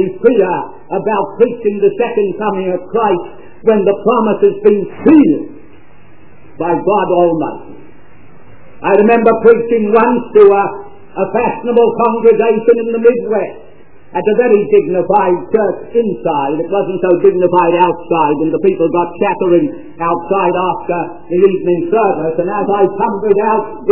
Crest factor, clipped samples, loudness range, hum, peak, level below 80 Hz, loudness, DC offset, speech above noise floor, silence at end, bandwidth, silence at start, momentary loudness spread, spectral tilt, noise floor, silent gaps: 12 dB; 0.3%; 3 LU; none; 0 dBFS; -52 dBFS; -12 LUFS; 2%; 31 dB; 0 s; 4 kHz; 0 s; 9 LU; -11 dB/octave; -43 dBFS; none